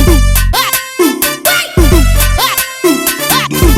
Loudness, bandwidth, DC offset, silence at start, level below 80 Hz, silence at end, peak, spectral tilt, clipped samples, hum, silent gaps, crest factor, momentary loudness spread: -10 LUFS; 17.5 kHz; under 0.1%; 0 s; -14 dBFS; 0 s; 0 dBFS; -3.5 dB/octave; 0.4%; none; none; 10 dB; 3 LU